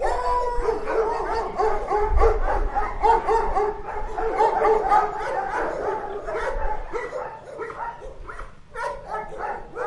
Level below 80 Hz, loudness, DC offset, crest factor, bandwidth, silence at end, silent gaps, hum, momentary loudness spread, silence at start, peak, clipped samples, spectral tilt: -30 dBFS; -24 LUFS; under 0.1%; 18 dB; 11 kHz; 0 s; none; none; 14 LU; 0 s; -6 dBFS; under 0.1%; -6 dB/octave